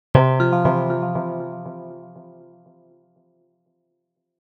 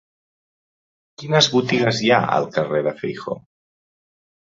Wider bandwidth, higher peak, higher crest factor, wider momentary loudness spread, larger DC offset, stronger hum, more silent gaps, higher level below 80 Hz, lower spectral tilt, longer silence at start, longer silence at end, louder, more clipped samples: second, 5 kHz vs 7.8 kHz; about the same, 0 dBFS vs -2 dBFS; about the same, 24 dB vs 20 dB; first, 22 LU vs 15 LU; neither; neither; neither; first, -48 dBFS vs -60 dBFS; first, -10 dB/octave vs -4.5 dB/octave; second, 0.15 s vs 1.2 s; first, 2.1 s vs 1.05 s; about the same, -20 LUFS vs -19 LUFS; neither